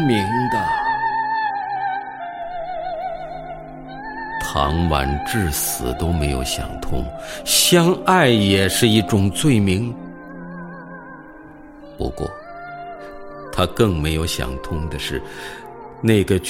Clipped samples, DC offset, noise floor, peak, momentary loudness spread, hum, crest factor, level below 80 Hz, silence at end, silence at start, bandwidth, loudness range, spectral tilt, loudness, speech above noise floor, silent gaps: under 0.1%; under 0.1%; -40 dBFS; -2 dBFS; 20 LU; none; 18 dB; -34 dBFS; 0 s; 0 s; 16.5 kHz; 11 LU; -4.5 dB/octave; -20 LUFS; 22 dB; none